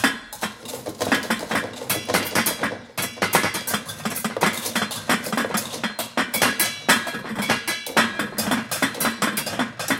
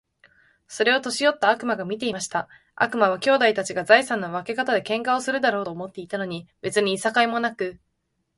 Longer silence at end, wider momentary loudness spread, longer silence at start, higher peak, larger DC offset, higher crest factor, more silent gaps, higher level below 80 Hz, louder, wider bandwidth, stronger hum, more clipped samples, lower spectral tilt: second, 0 s vs 0.6 s; second, 8 LU vs 13 LU; second, 0 s vs 0.7 s; about the same, -2 dBFS vs -2 dBFS; neither; about the same, 22 dB vs 22 dB; neither; first, -58 dBFS vs -68 dBFS; about the same, -23 LUFS vs -23 LUFS; first, 17 kHz vs 11.5 kHz; neither; neither; about the same, -2.5 dB/octave vs -3.5 dB/octave